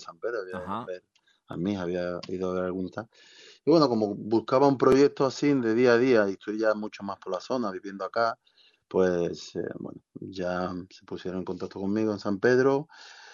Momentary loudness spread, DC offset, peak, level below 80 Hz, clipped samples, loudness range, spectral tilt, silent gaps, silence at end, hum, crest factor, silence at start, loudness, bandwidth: 19 LU; under 0.1%; -6 dBFS; -68 dBFS; under 0.1%; 9 LU; -6.5 dB/octave; none; 0 s; none; 20 dB; 0 s; -27 LUFS; 7.4 kHz